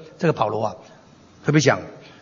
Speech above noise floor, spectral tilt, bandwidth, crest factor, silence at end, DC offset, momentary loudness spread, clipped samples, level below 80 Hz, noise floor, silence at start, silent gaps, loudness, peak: 27 dB; -5.5 dB/octave; 7.4 kHz; 22 dB; 0.2 s; under 0.1%; 17 LU; under 0.1%; -62 dBFS; -47 dBFS; 0 s; none; -21 LUFS; -2 dBFS